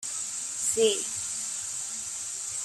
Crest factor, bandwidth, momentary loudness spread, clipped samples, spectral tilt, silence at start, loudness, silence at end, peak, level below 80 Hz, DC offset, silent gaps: 20 dB; 15.5 kHz; 8 LU; under 0.1%; 0 dB/octave; 0 s; -29 LUFS; 0 s; -10 dBFS; -70 dBFS; under 0.1%; none